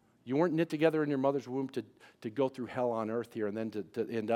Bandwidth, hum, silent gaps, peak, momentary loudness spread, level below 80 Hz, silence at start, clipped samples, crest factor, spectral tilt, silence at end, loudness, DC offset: 15 kHz; none; none; -14 dBFS; 10 LU; -84 dBFS; 0.25 s; under 0.1%; 20 dB; -7.5 dB/octave; 0 s; -33 LUFS; under 0.1%